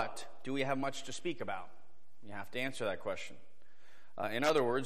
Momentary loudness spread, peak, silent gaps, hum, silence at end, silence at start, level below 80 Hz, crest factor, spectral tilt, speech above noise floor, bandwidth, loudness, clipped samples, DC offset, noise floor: 17 LU; -18 dBFS; none; none; 0 s; 0 s; -74 dBFS; 20 dB; -4.5 dB/octave; 30 dB; 15.5 kHz; -37 LUFS; under 0.1%; 1%; -67 dBFS